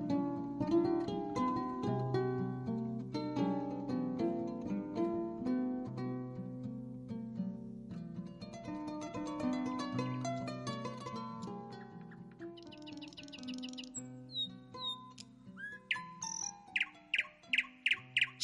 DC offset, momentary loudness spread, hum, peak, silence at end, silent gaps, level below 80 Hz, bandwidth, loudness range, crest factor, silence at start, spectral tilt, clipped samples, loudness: under 0.1%; 14 LU; none; -20 dBFS; 0 s; none; -68 dBFS; 11.5 kHz; 8 LU; 18 dB; 0 s; -4.5 dB/octave; under 0.1%; -39 LUFS